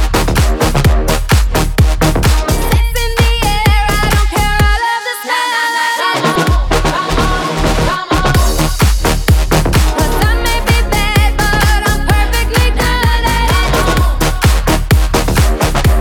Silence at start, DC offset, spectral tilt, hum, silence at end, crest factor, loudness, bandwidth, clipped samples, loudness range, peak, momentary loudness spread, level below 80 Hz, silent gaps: 0 s; under 0.1%; -4.5 dB/octave; none; 0 s; 10 dB; -12 LUFS; 19 kHz; under 0.1%; 1 LU; 0 dBFS; 2 LU; -14 dBFS; none